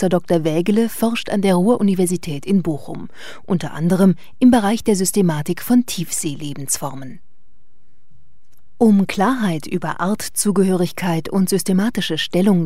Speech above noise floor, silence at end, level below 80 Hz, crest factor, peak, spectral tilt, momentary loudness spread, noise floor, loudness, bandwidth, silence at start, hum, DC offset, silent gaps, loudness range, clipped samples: 45 dB; 0 s; -52 dBFS; 16 dB; -2 dBFS; -5.5 dB/octave; 9 LU; -62 dBFS; -18 LUFS; 16 kHz; 0 s; none; 3%; none; 5 LU; under 0.1%